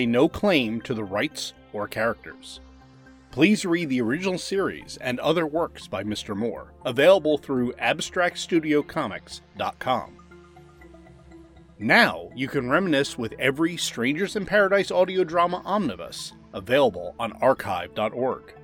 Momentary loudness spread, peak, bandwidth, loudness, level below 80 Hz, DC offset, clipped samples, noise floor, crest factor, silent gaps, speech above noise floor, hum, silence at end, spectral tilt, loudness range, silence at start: 13 LU; -4 dBFS; 18 kHz; -24 LUFS; -56 dBFS; under 0.1%; under 0.1%; -50 dBFS; 20 dB; none; 26 dB; none; 0 s; -4.5 dB/octave; 4 LU; 0 s